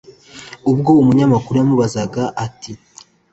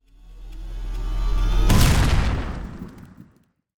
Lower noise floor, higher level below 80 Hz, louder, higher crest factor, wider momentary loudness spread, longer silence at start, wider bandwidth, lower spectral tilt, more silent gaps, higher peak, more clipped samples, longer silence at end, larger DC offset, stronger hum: second, -38 dBFS vs -59 dBFS; second, -48 dBFS vs -24 dBFS; first, -15 LUFS vs -22 LUFS; about the same, 14 dB vs 18 dB; about the same, 23 LU vs 22 LU; about the same, 0.35 s vs 0.25 s; second, 8.2 kHz vs 19 kHz; first, -7.5 dB/octave vs -5 dB/octave; neither; about the same, -2 dBFS vs -4 dBFS; neither; about the same, 0.55 s vs 0.55 s; neither; neither